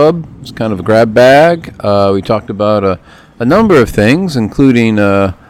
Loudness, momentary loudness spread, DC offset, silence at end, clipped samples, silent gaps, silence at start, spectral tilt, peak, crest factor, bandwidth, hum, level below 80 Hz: -10 LUFS; 11 LU; under 0.1%; 0.15 s; 1%; none; 0 s; -7 dB/octave; 0 dBFS; 10 dB; 16 kHz; none; -36 dBFS